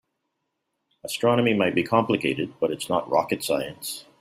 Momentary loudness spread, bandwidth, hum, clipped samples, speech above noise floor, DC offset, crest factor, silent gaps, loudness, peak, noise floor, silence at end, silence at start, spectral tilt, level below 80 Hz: 12 LU; 16 kHz; none; under 0.1%; 54 dB; under 0.1%; 20 dB; none; -24 LUFS; -4 dBFS; -78 dBFS; 0.2 s; 1.05 s; -5 dB/octave; -64 dBFS